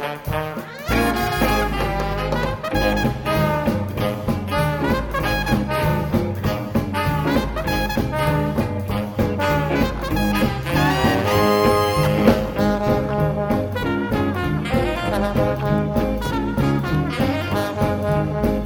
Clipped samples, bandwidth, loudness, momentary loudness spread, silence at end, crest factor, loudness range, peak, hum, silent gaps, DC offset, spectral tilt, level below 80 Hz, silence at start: under 0.1%; over 20 kHz; -21 LUFS; 6 LU; 0 s; 18 dB; 3 LU; -2 dBFS; none; none; under 0.1%; -6.5 dB/octave; -32 dBFS; 0 s